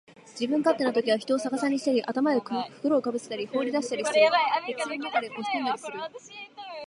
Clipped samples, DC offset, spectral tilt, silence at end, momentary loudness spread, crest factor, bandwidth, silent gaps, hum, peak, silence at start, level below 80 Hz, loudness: under 0.1%; under 0.1%; -3.5 dB/octave; 0 s; 15 LU; 18 dB; 11.5 kHz; none; none; -8 dBFS; 0.1 s; -80 dBFS; -27 LUFS